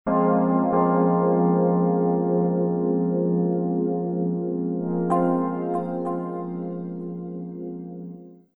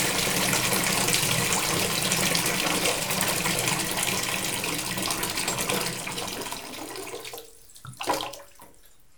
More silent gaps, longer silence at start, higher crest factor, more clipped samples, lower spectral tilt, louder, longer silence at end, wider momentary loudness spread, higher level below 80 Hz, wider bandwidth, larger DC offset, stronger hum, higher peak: neither; about the same, 0.05 s vs 0 s; second, 14 dB vs 22 dB; neither; first, -12 dB/octave vs -2 dB/octave; about the same, -23 LUFS vs -25 LUFS; second, 0.2 s vs 0.5 s; about the same, 14 LU vs 14 LU; second, -60 dBFS vs -52 dBFS; second, 2.2 kHz vs over 20 kHz; second, under 0.1% vs 0.2%; neither; about the same, -8 dBFS vs -6 dBFS